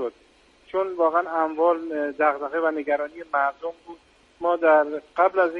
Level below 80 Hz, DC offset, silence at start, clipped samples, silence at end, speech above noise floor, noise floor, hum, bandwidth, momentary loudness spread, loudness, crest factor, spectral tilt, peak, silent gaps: -66 dBFS; under 0.1%; 0 s; under 0.1%; 0 s; 34 dB; -57 dBFS; none; 6.4 kHz; 9 LU; -23 LUFS; 18 dB; -6 dB/octave; -6 dBFS; none